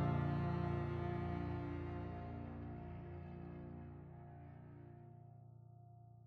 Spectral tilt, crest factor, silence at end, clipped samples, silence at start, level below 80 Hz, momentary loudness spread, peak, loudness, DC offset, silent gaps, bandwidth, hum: -10 dB/octave; 18 dB; 0 s; under 0.1%; 0 s; -58 dBFS; 20 LU; -28 dBFS; -45 LUFS; under 0.1%; none; 5 kHz; none